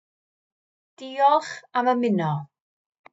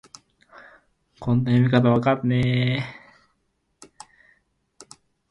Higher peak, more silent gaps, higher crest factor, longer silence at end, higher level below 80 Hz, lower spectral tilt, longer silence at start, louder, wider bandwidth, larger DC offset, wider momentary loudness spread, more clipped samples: about the same, -8 dBFS vs -6 dBFS; neither; about the same, 18 dB vs 18 dB; second, 0.65 s vs 2.4 s; second, under -90 dBFS vs -52 dBFS; about the same, -6.5 dB/octave vs -7.5 dB/octave; second, 1 s vs 1.2 s; about the same, -23 LUFS vs -21 LUFS; second, 8 kHz vs 9 kHz; neither; first, 14 LU vs 11 LU; neither